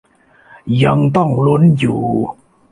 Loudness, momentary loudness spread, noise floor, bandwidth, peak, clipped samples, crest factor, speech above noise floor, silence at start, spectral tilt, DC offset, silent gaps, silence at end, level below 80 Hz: -14 LUFS; 9 LU; -47 dBFS; 10.5 kHz; -2 dBFS; under 0.1%; 12 dB; 35 dB; 0.65 s; -8.5 dB/octave; under 0.1%; none; 0.4 s; -46 dBFS